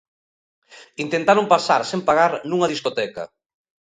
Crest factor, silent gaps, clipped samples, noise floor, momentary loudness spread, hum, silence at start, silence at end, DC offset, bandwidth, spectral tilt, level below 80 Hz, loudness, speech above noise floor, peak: 20 dB; none; under 0.1%; under -90 dBFS; 15 LU; none; 0.75 s; 0.7 s; under 0.1%; 9.6 kHz; -4.5 dB/octave; -64 dBFS; -19 LUFS; over 71 dB; -2 dBFS